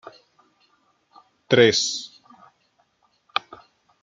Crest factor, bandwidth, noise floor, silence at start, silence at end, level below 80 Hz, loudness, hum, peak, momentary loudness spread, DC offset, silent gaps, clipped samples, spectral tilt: 24 dB; 9.4 kHz; -67 dBFS; 0.05 s; 1.95 s; -66 dBFS; -21 LUFS; none; -2 dBFS; 15 LU; under 0.1%; none; under 0.1%; -3.5 dB/octave